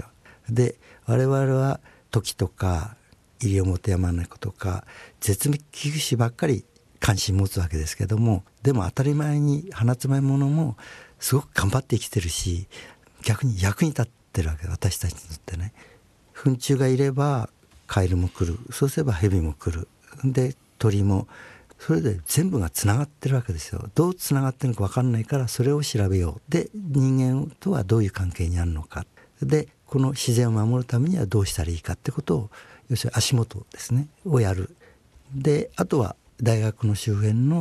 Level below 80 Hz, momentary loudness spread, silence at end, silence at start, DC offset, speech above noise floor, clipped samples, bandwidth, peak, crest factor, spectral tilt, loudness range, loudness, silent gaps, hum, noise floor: -44 dBFS; 9 LU; 0 s; 0 s; under 0.1%; 30 dB; under 0.1%; 13 kHz; -6 dBFS; 18 dB; -6 dB/octave; 3 LU; -24 LUFS; none; none; -53 dBFS